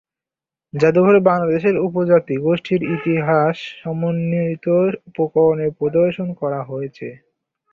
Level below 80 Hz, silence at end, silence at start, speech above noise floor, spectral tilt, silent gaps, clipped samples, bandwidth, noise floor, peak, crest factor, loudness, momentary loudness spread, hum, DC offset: -58 dBFS; 0.55 s; 0.75 s; 72 dB; -9 dB/octave; none; under 0.1%; 7.2 kHz; -89 dBFS; -2 dBFS; 16 dB; -18 LUFS; 13 LU; none; under 0.1%